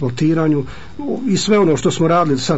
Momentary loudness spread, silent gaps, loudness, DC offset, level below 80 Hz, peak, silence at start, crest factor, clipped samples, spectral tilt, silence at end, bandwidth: 11 LU; none; -16 LUFS; 3%; -44 dBFS; -4 dBFS; 0 s; 12 dB; under 0.1%; -6 dB/octave; 0 s; 8 kHz